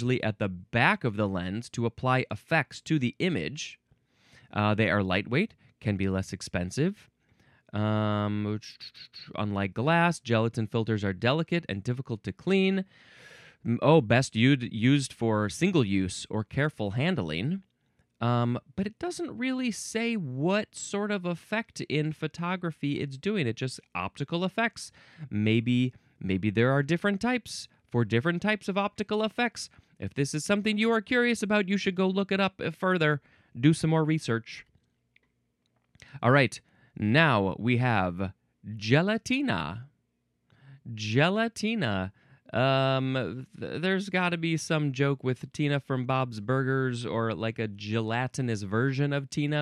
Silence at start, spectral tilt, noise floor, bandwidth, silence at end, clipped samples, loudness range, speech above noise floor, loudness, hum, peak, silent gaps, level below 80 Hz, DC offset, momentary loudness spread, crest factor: 0 s; -6 dB/octave; -76 dBFS; 12.5 kHz; 0 s; under 0.1%; 5 LU; 48 dB; -28 LUFS; none; -8 dBFS; none; -62 dBFS; under 0.1%; 11 LU; 20 dB